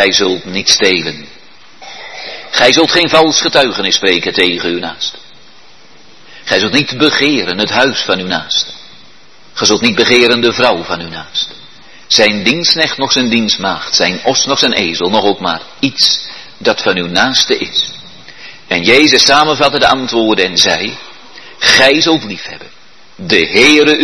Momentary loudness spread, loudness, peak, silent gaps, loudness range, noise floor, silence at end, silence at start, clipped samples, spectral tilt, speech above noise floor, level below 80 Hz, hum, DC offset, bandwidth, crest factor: 14 LU; -10 LUFS; 0 dBFS; none; 3 LU; -43 dBFS; 0 s; 0 s; 0.4%; -2.5 dB/octave; 31 dB; -48 dBFS; none; 1%; 12 kHz; 12 dB